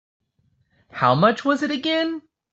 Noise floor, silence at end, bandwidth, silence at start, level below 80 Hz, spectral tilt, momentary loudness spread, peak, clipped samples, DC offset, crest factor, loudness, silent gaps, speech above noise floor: -66 dBFS; 0.35 s; 8 kHz; 0.95 s; -64 dBFS; -6 dB/octave; 14 LU; -4 dBFS; under 0.1%; under 0.1%; 20 dB; -20 LUFS; none; 46 dB